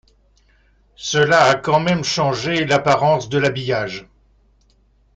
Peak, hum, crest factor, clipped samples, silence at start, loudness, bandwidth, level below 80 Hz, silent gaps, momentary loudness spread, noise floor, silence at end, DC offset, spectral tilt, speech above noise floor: -2 dBFS; none; 18 dB; under 0.1%; 1 s; -17 LUFS; 9.4 kHz; -52 dBFS; none; 9 LU; -57 dBFS; 1.15 s; under 0.1%; -4.5 dB/octave; 40 dB